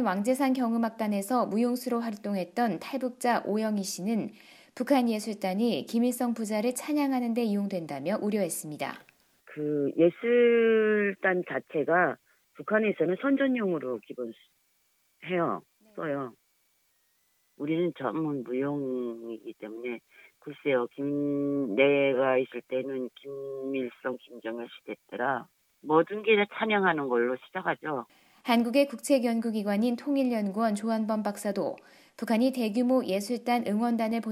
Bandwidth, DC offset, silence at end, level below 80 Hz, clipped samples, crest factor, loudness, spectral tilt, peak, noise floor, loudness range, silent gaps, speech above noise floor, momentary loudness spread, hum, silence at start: 15 kHz; under 0.1%; 0 s; -82 dBFS; under 0.1%; 20 dB; -28 LUFS; -5.5 dB/octave; -8 dBFS; -71 dBFS; 7 LU; none; 43 dB; 14 LU; none; 0 s